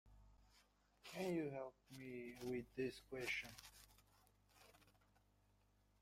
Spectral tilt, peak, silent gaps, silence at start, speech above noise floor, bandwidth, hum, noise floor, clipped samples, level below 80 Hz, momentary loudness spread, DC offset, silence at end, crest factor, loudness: -5 dB/octave; -34 dBFS; none; 0.05 s; 29 dB; 16 kHz; 50 Hz at -75 dBFS; -77 dBFS; under 0.1%; -74 dBFS; 22 LU; under 0.1%; 1.1 s; 18 dB; -49 LUFS